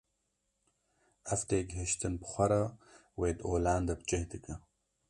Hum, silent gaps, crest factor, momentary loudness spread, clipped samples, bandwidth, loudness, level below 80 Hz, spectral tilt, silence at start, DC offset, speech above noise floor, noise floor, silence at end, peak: none; none; 20 dB; 16 LU; under 0.1%; 11.5 kHz; -34 LUFS; -48 dBFS; -5.5 dB/octave; 1.25 s; under 0.1%; 48 dB; -81 dBFS; 0.5 s; -16 dBFS